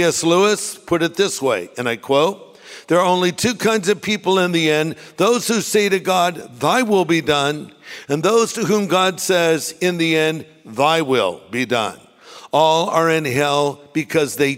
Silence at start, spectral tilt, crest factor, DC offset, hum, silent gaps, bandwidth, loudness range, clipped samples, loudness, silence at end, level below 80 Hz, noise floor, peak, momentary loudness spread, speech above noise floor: 0 s; -4 dB/octave; 16 dB; under 0.1%; none; none; 16 kHz; 1 LU; under 0.1%; -18 LUFS; 0 s; -60 dBFS; -37 dBFS; -2 dBFS; 8 LU; 20 dB